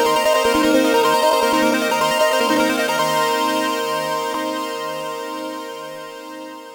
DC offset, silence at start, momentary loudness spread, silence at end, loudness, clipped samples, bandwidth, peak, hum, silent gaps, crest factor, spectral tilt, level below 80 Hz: under 0.1%; 0 s; 16 LU; 0 s; -18 LUFS; under 0.1%; over 20 kHz; -4 dBFS; none; none; 14 dB; -2.5 dB/octave; -54 dBFS